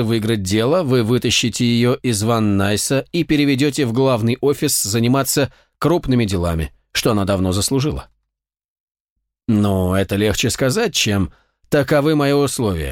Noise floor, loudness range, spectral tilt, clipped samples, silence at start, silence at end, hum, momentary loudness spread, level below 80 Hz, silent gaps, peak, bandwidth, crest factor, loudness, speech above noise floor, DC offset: -80 dBFS; 4 LU; -5 dB/octave; under 0.1%; 0 s; 0 s; none; 5 LU; -40 dBFS; 8.65-8.88 s, 9.00-9.16 s; -4 dBFS; 17 kHz; 14 dB; -17 LUFS; 63 dB; under 0.1%